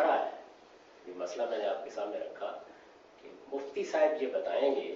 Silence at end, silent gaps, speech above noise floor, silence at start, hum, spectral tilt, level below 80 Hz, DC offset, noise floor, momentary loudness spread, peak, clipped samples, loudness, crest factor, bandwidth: 0 s; none; 24 dB; 0 s; none; -1 dB/octave; -82 dBFS; under 0.1%; -57 dBFS; 23 LU; -16 dBFS; under 0.1%; -34 LUFS; 20 dB; 7.6 kHz